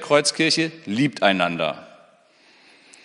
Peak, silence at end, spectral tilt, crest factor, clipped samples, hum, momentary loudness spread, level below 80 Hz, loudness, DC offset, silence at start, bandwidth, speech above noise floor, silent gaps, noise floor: -2 dBFS; 1.2 s; -3.5 dB/octave; 22 dB; under 0.1%; none; 8 LU; -70 dBFS; -20 LUFS; under 0.1%; 0 s; 10.5 kHz; 35 dB; none; -55 dBFS